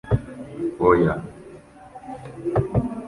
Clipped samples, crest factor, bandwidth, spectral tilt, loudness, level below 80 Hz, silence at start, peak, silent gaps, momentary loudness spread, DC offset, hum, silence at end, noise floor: under 0.1%; 20 dB; 11.5 kHz; -9.5 dB/octave; -22 LUFS; -40 dBFS; 0.05 s; -4 dBFS; none; 24 LU; under 0.1%; none; 0 s; -44 dBFS